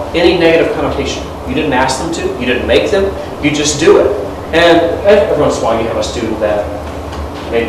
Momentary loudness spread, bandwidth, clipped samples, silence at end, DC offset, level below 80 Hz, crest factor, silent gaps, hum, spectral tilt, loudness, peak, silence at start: 11 LU; 13.5 kHz; 0.8%; 0 s; 0.2%; -30 dBFS; 12 dB; none; none; -4.5 dB/octave; -12 LUFS; 0 dBFS; 0 s